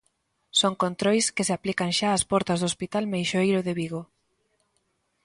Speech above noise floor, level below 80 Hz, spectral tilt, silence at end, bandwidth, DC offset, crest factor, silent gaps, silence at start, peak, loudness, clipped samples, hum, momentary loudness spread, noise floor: 48 dB; -60 dBFS; -4 dB/octave; 1.2 s; 11.5 kHz; under 0.1%; 18 dB; none; 0.55 s; -8 dBFS; -25 LUFS; under 0.1%; none; 6 LU; -73 dBFS